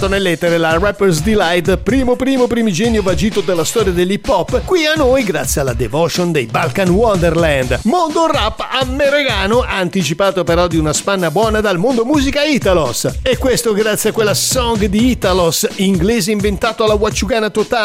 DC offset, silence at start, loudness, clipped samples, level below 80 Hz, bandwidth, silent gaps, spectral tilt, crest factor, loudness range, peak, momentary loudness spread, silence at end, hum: under 0.1%; 0 s; -14 LUFS; under 0.1%; -28 dBFS; 16 kHz; none; -4.5 dB/octave; 12 dB; 1 LU; -2 dBFS; 3 LU; 0 s; none